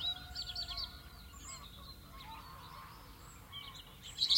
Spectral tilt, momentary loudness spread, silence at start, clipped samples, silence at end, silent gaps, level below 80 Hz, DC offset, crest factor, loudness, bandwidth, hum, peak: -1.5 dB/octave; 14 LU; 0 s; under 0.1%; 0 s; none; -58 dBFS; under 0.1%; 26 dB; -45 LUFS; 16.5 kHz; none; -16 dBFS